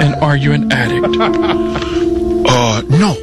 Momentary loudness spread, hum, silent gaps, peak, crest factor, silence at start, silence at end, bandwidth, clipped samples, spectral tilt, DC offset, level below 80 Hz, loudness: 4 LU; none; none; 0 dBFS; 12 dB; 0 s; 0 s; 12 kHz; under 0.1%; -5.5 dB/octave; under 0.1%; -32 dBFS; -13 LUFS